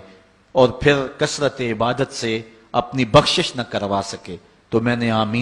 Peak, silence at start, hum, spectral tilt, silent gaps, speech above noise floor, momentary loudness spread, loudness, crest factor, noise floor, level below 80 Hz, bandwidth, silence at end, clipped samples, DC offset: 0 dBFS; 0.55 s; none; -5 dB/octave; none; 30 dB; 10 LU; -19 LUFS; 20 dB; -49 dBFS; -44 dBFS; 12 kHz; 0 s; under 0.1%; under 0.1%